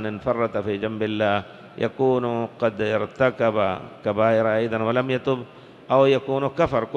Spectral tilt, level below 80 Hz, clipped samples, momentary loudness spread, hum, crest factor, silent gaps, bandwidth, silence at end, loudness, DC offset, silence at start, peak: -7.5 dB/octave; -54 dBFS; under 0.1%; 8 LU; none; 18 dB; none; 7.4 kHz; 0 s; -23 LUFS; under 0.1%; 0 s; -4 dBFS